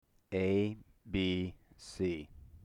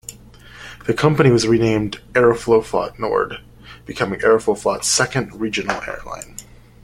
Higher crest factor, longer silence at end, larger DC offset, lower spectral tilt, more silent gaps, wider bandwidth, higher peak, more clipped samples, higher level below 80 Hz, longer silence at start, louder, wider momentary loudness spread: about the same, 14 dB vs 18 dB; second, 0.05 s vs 0.45 s; neither; first, -6.5 dB/octave vs -4.5 dB/octave; neither; second, 11 kHz vs 16 kHz; second, -22 dBFS vs -2 dBFS; neither; second, -58 dBFS vs -44 dBFS; first, 0.3 s vs 0.1 s; second, -36 LUFS vs -18 LUFS; about the same, 18 LU vs 19 LU